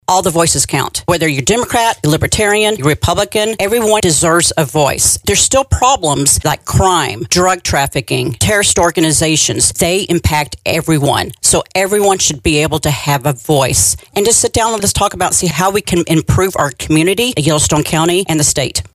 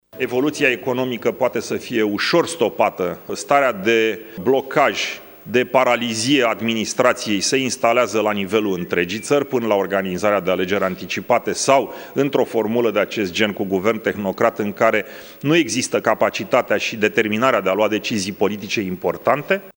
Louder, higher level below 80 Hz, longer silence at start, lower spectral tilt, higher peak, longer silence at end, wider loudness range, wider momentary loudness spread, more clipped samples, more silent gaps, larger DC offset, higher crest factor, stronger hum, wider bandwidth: first, -12 LUFS vs -19 LUFS; first, -32 dBFS vs -60 dBFS; about the same, 0.1 s vs 0.15 s; about the same, -3.5 dB/octave vs -4 dB/octave; about the same, 0 dBFS vs 0 dBFS; about the same, 0.1 s vs 0.05 s; about the same, 2 LU vs 2 LU; about the same, 5 LU vs 6 LU; neither; neither; neither; second, 12 dB vs 18 dB; neither; about the same, 16 kHz vs 17 kHz